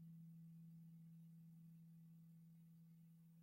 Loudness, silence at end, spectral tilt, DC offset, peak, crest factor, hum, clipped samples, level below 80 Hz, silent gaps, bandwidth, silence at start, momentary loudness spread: -64 LUFS; 0 s; -8.5 dB/octave; under 0.1%; -54 dBFS; 8 dB; none; under 0.1%; under -90 dBFS; none; 16 kHz; 0 s; 5 LU